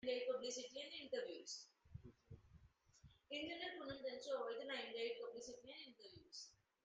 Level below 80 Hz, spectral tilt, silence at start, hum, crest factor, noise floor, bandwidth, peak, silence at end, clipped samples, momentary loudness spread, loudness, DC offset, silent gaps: -78 dBFS; -2.5 dB/octave; 0 s; none; 18 dB; -70 dBFS; 9.4 kHz; -32 dBFS; 0.35 s; under 0.1%; 16 LU; -49 LUFS; under 0.1%; none